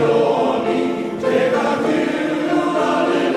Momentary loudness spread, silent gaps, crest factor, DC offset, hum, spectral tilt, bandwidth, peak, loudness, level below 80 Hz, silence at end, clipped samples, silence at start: 4 LU; none; 14 dB; under 0.1%; none; -5.5 dB/octave; 12.5 kHz; -4 dBFS; -18 LUFS; -56 dBFS; 0 s; under 0.1%; 0 s